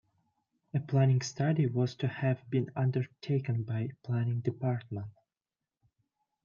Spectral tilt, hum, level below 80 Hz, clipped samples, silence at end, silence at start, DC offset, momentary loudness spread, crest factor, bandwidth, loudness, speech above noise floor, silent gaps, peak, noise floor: -7.5 dB/octave; none; -72 dBFS; under 0.1%; 1.35 s; 0.75 s; under 0.1%; 9 LU; 18 dB; 7.2 kHz; -32 LUFS; over 59 dB; none; -14 dBFS; under -90 dBFS